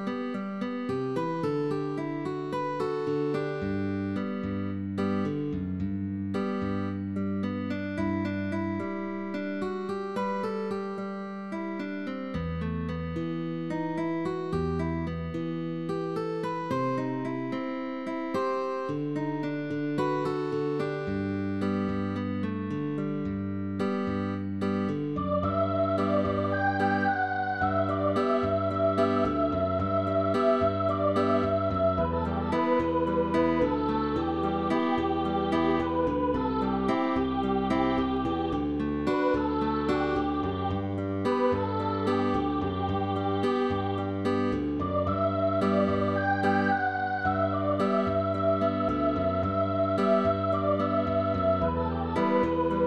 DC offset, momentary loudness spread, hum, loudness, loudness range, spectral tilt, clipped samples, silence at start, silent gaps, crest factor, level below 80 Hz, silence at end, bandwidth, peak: 0.1%; 7 LU; none; -29 LUFS; 5 LU; -8 dB/octave; under 0.1%; 0 s; none; 16 dB; -48 dBFS; 0 s; 11 kHz; -12 dBFS